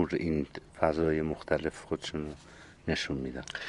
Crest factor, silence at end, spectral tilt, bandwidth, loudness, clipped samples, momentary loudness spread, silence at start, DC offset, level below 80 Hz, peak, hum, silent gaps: 24 dB; 0 s; -5.5 dB/octave; 11.5 kHz; -33 LUFS; under 0.1%; 12 LU; 0 s; under 0.1%; -48 dBFS; -8 dBFS; none; none